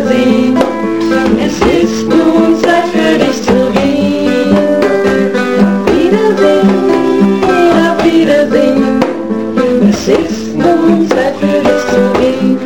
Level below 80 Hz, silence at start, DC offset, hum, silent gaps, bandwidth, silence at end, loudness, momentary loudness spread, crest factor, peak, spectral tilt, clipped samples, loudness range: -36 dBFS; 0 s; 2%; none; none; 17.5 kHz; 0 s; -10 LUFS; 3 LU; 10 dB; 0 dBFS; -6 dB/octave; under 0.1%; 2 LU